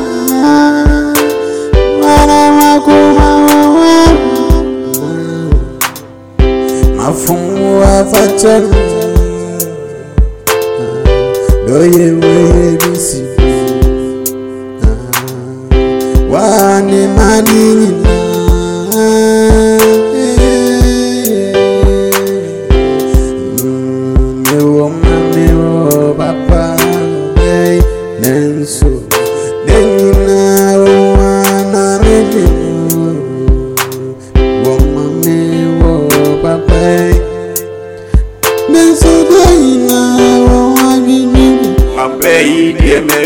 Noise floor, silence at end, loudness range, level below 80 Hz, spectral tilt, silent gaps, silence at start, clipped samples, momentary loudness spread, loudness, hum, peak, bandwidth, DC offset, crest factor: -28 dBFS; 0 s; 5 LU; -16 dBFS; -5.5 dB/octave; none; 0 s; 2%; 9 LU; -9 LUFS; none; 0 dBFS; 18 kHz; 0.3%; 8 dB